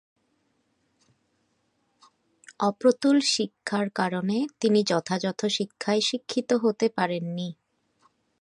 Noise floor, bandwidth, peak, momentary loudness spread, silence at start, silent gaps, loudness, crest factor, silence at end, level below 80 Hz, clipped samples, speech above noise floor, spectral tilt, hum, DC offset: -72 dBFS; 11 kHz; -8 dBFS; 7 LU; 2.5 s; none; -25 LUFS; 20 dB; 0.9 s; -76 dBFS; under 0.1%; 47 dB; -4.5 dB/octave; none; under 0.1%